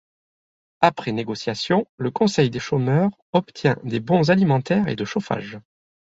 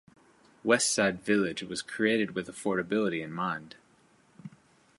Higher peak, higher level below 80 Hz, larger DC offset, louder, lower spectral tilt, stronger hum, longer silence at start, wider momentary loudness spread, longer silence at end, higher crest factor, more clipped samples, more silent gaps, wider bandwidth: first, -2 dBFS vs -8 dBFS; first, -58 dBFS vs -68 dBFS; neither; first, -21 LUFS vs -29 LUFS; first, -6.5 dB/octave vs -3.5 dB/octave; neither; first, 0.8 s vs 0.65 s; second, 9 LU vs 18 LU; about the same, 0.5 s vs 0.5 s; about the same, 20 dB vs 22 dB; neither; first, 1.89-1.98 s, 3.22-3.33 s vs none; second, 7.8 kHz vs 11.5 kHz